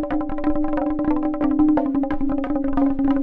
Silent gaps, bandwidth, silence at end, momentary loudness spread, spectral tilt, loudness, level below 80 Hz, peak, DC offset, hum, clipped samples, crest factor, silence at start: none; 4 kHz; 0 s; 5 LU; -10 dB/octave; -21 LUFS; -32 dBFS; -8 dBFS; under 0.1%; none; under 0.1%; 12 dB; 0 s